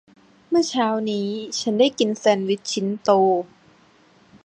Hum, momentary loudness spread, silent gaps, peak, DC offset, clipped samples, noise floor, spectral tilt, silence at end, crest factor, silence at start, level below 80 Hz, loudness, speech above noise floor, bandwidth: none; 7 LU; none; -2 dBFS; under 0.1%; under 0.1%; -55 dBFS; -4.5 dB/octave; 1 s; 20 dB; 0.5 s; -70 dBFS; -21 LUFS; 34 dB; 10.5 kHz